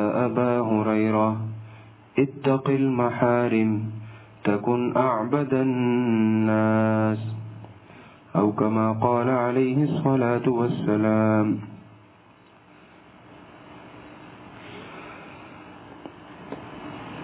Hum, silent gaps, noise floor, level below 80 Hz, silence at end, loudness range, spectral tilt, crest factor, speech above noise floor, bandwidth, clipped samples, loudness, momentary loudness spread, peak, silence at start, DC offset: none; none; -53 dBFS; -62 dBFS; 0 s; 20 LU; -12 dB/octave; 18 dB; 31 dB; 4 kHz; under 0.1%; -23 LUFS; 22 LU; -6 dBFS; 0 s; under 0.1%